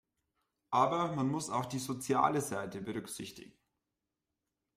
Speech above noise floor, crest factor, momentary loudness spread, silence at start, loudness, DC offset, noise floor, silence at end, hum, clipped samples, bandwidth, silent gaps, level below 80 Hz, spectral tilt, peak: 54 dB; 22 dB; 13 LU; 0.7 s; -34 LUFS; under 0.1%; -88 dBFS; 1.3 s; none; under 0.1%; 15.5 kHz; none; -72 dBFS; -5 dB/octave; -14 dBFS